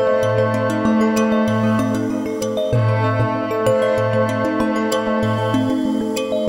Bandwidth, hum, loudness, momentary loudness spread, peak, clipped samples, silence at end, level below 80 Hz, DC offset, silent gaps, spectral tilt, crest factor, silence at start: 17 kHz; none; -18 LUFS; 4 LU; -6 dBFS; under 0.1%; 0 s; -46 dBFS; under 0.1%; none; -6.5 dB/octave; 12 dB; 0 s